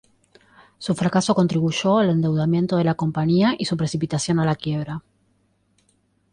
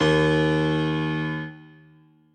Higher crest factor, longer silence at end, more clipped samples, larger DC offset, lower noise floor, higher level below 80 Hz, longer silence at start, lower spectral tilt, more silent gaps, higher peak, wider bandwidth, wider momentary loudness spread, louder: about the same, 14 dB vs 16 dB; first, 1.35 s vs 0.7 s; neither; neither; first, -65 dBFS vs -55 dBFS; second, -56 dBFS vs -46 dBFS; first, 0.8 s vs 0 s; about the same, -6 dB/octave vs -6.5 dB/octave; neither; about the same, -8 dBFS vs -8 dBFS; first, 10.5 kHz vs 9 kHz; second, 8 LU vs 12 LU; about the same, -21 LUFS vs -23 LUFS